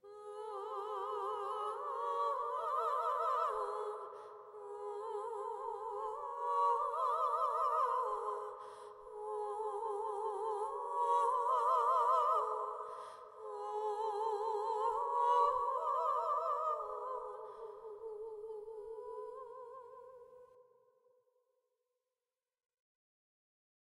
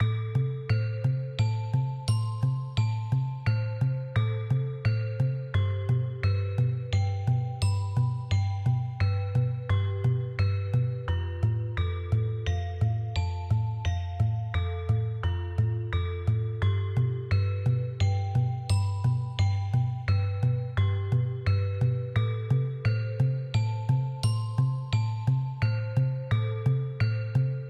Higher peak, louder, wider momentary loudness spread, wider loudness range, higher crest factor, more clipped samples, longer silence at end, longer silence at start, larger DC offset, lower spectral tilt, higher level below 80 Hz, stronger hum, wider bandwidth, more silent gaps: second, -22 dBFS vs -14 dBFS; second, -37 LUFS vs -28 LUFS; first, 17 LU vs 2 LU; first, 14 LU vs 2 LU; about the same, 18 dB vs 14 dB; neither; first, 3.35 s vs 0 s; about the same, 0.05 s vs 0 s; neither; second, -2.5 dB/octave vs -7.5 dB/octave; second, -80 dBFS vs -44 dBFS; neither; first, 13 kHz vs 9.6 kHz; neither